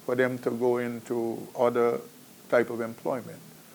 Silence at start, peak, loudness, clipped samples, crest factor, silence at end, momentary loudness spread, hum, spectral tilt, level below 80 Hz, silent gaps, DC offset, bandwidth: 0 s; -10 dBFS; -28 LUFS; under 0.1%; 18 dB; 0.1 s; 10 LU; none; -6 dB/octave; -74 dBFS; none; under 0.1%; over 20 kHz